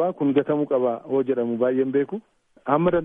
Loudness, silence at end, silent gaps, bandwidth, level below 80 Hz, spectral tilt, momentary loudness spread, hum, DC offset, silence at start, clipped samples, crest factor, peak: -23 LUFS; 0 s; none; 3.8 kHz; -56 dBFS; -10.5 dB/octave; 7 LU; none; under 0.1%; 0 s; under 0.1%; 18 dB; -6 dBFS